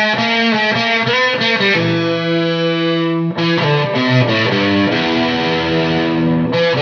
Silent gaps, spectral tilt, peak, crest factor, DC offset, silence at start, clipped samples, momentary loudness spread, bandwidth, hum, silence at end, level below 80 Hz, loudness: none; -6 dB/octave; 0 dBFS; 14 dB; under 0.1%; 0 s; under 0.1%; 3 LU; 5.4 kHz; none; 0 s; -50 dBFS; -14 LUFS